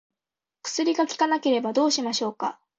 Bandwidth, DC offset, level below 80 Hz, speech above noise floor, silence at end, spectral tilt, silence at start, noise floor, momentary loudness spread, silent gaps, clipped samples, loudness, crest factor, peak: 8.2 kHz; under 0.1%; -76 dBFS; 66 dB; 0.25 s; -2.5 dB/octave; 0.65 s; -90 dBFS; 9 LU; none; under 0.1%; -24 LUFS; 16 dB; -10 dBFS